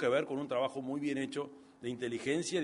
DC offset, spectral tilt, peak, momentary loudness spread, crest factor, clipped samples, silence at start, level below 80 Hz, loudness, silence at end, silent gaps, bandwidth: under 0.1%; -4.5 dB/octave; -20 dBFS; 9 LU; 16 dB; under 0.1%; 0 s; -76 dBFS; -36 LUFS; 0 s; none; 10.5 kHz